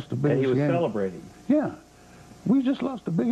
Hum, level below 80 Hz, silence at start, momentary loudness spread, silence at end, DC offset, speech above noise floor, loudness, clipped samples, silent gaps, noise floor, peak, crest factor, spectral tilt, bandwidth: none; -60 dBFS; 0 s; 11 LU; 0 s; under 0.1%; 25 dB; -25 LUFS; under 0.1%; none; -49 dBFS; -12 dBFS; 14 dB; -8.5 dB/octave; 9.2 kHz